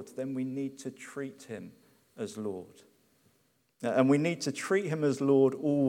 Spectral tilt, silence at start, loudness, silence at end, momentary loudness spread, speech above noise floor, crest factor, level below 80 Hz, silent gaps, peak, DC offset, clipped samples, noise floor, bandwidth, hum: -6.5 dB/octave; 0 s; -30 LUFS; 0 s; 18 LU; 42 dB; 20 dB; -80 dBFS; none; -10 dBFS; under 0.1%; under 0.1%; -72 dBFS; 14.5 kHz; none